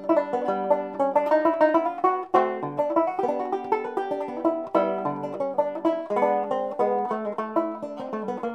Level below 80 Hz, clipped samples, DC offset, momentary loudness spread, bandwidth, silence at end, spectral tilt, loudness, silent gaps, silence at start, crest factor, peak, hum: -74 dBFS; under 0.1%; under 0.1%; 8 LU; 8.6 kHz; 0 s; -7.5 dB/octave; -25 LUFS; none; 0 s; 18 dB; -6 dBFS; none